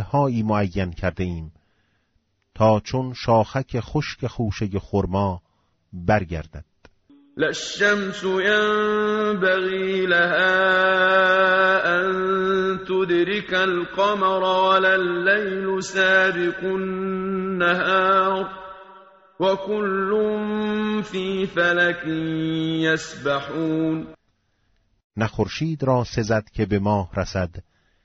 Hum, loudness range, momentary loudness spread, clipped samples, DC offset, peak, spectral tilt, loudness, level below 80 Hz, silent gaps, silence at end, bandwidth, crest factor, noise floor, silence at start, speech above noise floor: none; 7 LU; 10 LU; under 0.1%; under 0.1%; -6 dBFS; -3.5 dB/octave; -21 LUFS; -46 dBFS; 25.04-25.10 s; 0.45 s; 8 kHz; 16 dB; -68 dBFS; 0 s; 47 dB